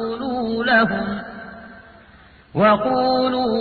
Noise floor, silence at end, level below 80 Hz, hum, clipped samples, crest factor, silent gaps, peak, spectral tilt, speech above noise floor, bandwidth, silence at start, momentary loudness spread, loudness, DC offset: -48 dBFS; 0 s; -50 dBFS; none; under 0.1%; 16 dB; none; -4 dBFS; -8.5 dB/octave; 30 dB; 4.8 kHz; 0 s; 19 LU; -19 LUFS; under 0.1%